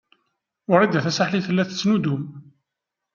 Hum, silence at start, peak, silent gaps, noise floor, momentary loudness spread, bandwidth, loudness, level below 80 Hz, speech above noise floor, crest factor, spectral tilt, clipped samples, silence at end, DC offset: none; 0.7 s; -2 dBFS; none; -84 dBFS; 12 LU; 7.2 kHz; -21 LUFS; -66 dBFS; 63 dB; 22 dB; -6 dB/octave; under 0.1%; 0.75 s; under 0.1%